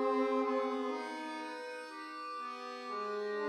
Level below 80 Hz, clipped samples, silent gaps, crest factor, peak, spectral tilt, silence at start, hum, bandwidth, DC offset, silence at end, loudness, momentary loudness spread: under -90 dBFS; under 0.1%; none; 14 dB; -22 dBFS; -4 dB/octave; 0 s; none; 11.5 kHz; under 0.1%; 0 s; -38 LUFS; 11 LU